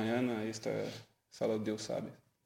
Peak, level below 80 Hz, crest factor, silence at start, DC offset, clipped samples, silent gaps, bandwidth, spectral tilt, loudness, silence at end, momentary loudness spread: -22 dBFS; -76 dBFS; 16 dB; 0 s; under 0.1%; under 0.1%; none; 16.5 kHz; -5.5 dB/octave; -38 LUFS; 0.3 s; 15 LU